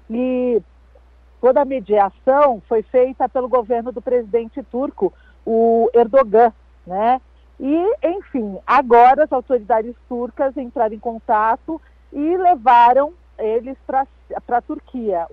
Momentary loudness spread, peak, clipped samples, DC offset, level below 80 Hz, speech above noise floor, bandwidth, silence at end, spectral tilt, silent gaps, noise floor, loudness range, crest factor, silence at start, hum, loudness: 13 LU; -2 dBFS; under 0.1%; under 0.1%; -48 dBFS; 31 dB; 5.4 kHz; 0.05 s; -8 dB/octave; none; -48 dBFS; 2 LU; 14 dB; 0.1 s; none; -17 LUFS